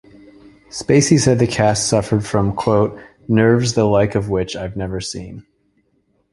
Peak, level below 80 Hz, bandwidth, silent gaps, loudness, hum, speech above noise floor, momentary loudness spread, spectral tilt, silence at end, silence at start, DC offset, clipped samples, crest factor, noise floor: 0 dBFS; -42 dBFS; 11.5 kHz; none; -17 LUFS; none; 47 dB; 14 LU; -5.5 dB/octave; 0.9 s; 0.75 s; under 0.1%; under 0.1%; 18 dB; -63 dBFS